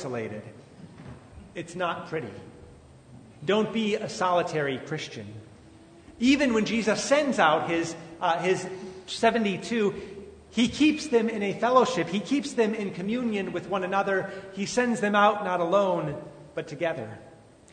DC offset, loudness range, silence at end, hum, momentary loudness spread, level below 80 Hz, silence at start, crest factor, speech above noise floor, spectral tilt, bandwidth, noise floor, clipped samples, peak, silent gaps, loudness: under 0.1%; 5 LU; 0.4 s; none; 18 LU; -60 dBFS; 0 s; 20 dB; 25 dB; -4.5 dB/octave; 9.6 kHz; -51 dBFS; under 0.1%; -6 dBFS; none; -26 LUFS